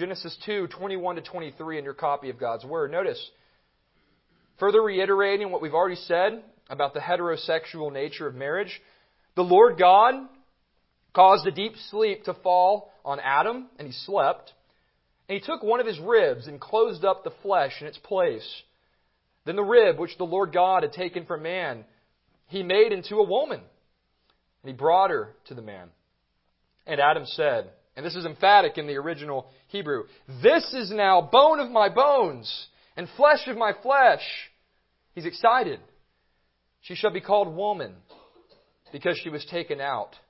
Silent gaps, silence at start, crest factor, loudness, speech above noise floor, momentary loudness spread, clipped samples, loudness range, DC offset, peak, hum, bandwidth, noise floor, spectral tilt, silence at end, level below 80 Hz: none; 0 s; 22 dB; -24 LUFS; 49 dB; 18 LU; under 0.1%; 8 LU; under 0.1%; -4 dBFS; none; 5.8 kHz; -72 dBFS; -8.5 dB/octave; 0.25 s; -72 dBFS